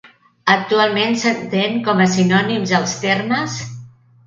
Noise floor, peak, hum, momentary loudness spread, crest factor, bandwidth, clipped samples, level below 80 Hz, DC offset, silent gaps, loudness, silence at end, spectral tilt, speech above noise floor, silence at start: -40 dBFS; 0 dBFS; none; 9 LU; 18 dB; 7.6 kHz; under 0.1%; -58 dBFS; under 0.1%; none; -17 LUFS; 0.4 s; -4.5 dB/octave; 23 dB; 0.05 s